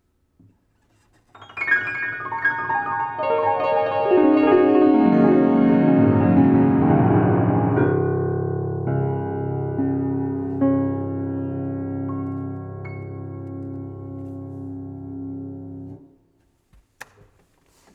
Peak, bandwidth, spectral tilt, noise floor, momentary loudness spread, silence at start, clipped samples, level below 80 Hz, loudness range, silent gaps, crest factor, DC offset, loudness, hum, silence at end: -4 dBFS; 5.2 kHz; -10 dB/octave; -63 dBFS; 18 LU; 1.4 s; under 0.1%; -54 dBFS; 18 LU; none; 18 dB; under 0.1%; -20 LUFS; none; 1.95 s